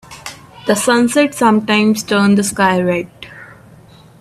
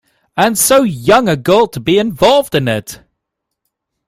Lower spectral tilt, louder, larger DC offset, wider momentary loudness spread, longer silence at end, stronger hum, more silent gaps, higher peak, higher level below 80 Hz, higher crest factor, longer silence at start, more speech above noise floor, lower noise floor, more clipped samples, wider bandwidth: about the same, -4.5 dB/octave vs -4 dB/octave; about the same, -14 LUFS vs -12 LUFS; neither; first, 19 LU vs 9 LU; second, 0.65 s vs 1.15 s; neither; neither; about the same, 0 dBFS vs 0 dBFS; second, -52 dBFS vs -44 dBFS; about the same, 14 dB vs 14 dB; second, 0.1 s vs 0.35 s; second, 29 dB vs 64 dB; second, -42 dBFS vs -76 dBFS; neither; second, 14 kHz vs 16 kHz